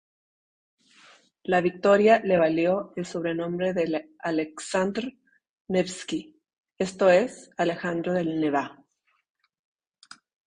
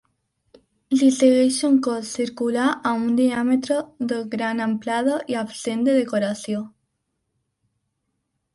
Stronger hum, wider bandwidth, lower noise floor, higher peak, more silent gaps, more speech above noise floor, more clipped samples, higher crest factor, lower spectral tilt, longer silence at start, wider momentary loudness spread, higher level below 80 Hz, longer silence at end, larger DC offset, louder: neither; about the same, 10.5 kHz vs 11.5 kHz; second, -70 dBFS vs -75 dBFS; about the same, -6 dBFS vs -4 dBFS; first, 5.49-5.65 s, 6.58-6.64 s vs none; second, 45 dB vs 55 dB; neither; about the same, 20 dB vs 18 dB; about the same, -5.5 dB/octave vs -4.5 dB/octave; first, 1.5 s vs 0.9 s; first, 13 LU vs 10 LU; about the same, -66 dBFS vs -66 dBFS; about the same, 1.75 s vs 1.85 s; neither; second, -25 LUFS vs -21 LUFS